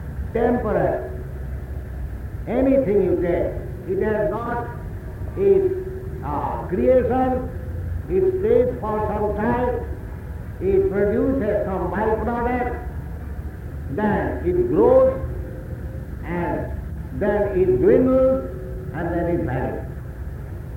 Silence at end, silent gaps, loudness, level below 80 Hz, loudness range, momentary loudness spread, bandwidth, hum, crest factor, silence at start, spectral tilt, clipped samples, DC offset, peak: 0 s; none; -22 LUFS; -34 dBFS; 3 LU; 15 LU; 16.5 kHz; none; 16 dB; 0 s; -9.5 dB/octave; under 0.1%; under 0.1%; -4 dBFS